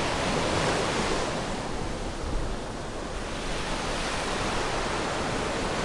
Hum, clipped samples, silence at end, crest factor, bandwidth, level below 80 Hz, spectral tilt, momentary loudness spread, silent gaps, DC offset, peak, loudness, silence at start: none; under 0.1%; 0 s; 14 dB; 11.5 kHz; -38 dBFS; -4 dB/octave; 8 LU; none; under 0.1%; -14 dBFS; -29 LUFS; 0 s